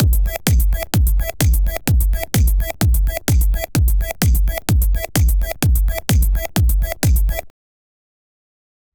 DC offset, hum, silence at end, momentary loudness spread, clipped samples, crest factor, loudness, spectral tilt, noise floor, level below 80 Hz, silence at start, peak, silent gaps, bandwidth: 0.5%; none; 1.45 s; 2 LU; under 0.1%; 16 dB; -18 LUFS; -5 dB/octave; under -90 dBFS; -18 dBFS; 0 s; 0 dBFS; none; over 20 kHz